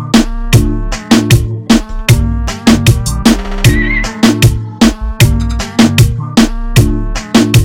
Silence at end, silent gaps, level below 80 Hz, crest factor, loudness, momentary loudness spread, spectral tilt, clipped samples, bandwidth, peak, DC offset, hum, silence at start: 0 s; none; -18 dBFS; 10 dB; -11 LUFS; 5 LU; -5 dB/octave; 2%; 19 kHz; 0 dBFS; 0.2%; none; 0 s